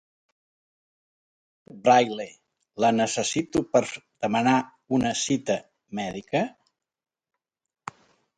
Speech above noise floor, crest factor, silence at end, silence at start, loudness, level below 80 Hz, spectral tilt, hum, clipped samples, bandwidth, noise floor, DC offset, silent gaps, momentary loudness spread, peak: 20 dB; 22 dB; 1.9 s; 1.75 s; -25 LUFS; -62 dBFS; -4 dB/octave; none; under 0.1%; 10.5 kHz; -44 dBFS; under 0.1%; none; 19 LU; -6 dBFS